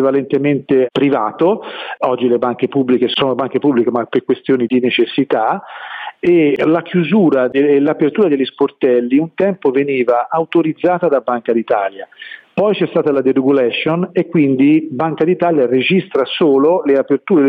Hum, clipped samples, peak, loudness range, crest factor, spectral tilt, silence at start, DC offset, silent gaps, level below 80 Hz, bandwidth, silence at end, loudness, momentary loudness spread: none; under 0.1%; -2 dBFS; 2 LU; 12 dB; -9 dB/octave; 0 s; under 0.1%; none; -62 dBFS; 4.9 kHz; 0 s; -14 LUFS; 5 LU